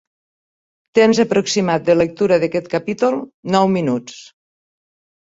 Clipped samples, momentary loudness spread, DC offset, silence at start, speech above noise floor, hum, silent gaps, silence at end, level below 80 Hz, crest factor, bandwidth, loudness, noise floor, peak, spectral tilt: under 0.1%; 8 LU; under 0.1%; 0.95 s; over 74 dB; none; 3.34-3.43 s; 1 s; -56 dBFS; 16 dB; 8 kHz; -17 LUFS; under -90 dBFS; -2 dBFS; -5.5 dB/octave